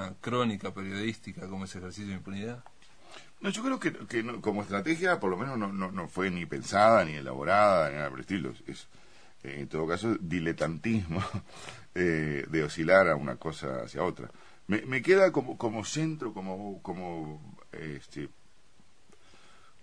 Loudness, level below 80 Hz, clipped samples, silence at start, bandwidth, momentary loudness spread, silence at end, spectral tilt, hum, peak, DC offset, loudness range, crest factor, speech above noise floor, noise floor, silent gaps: -30 LUFS; -60 dBFS; under 0.1%; 0 s; 10.5 kHz; 20 LU; 1.55 s; -5.5 dB/octave; none; -8 dBFS; 0.3%; 10 LU; 24 dB; 34 dB; -64 dBFS; none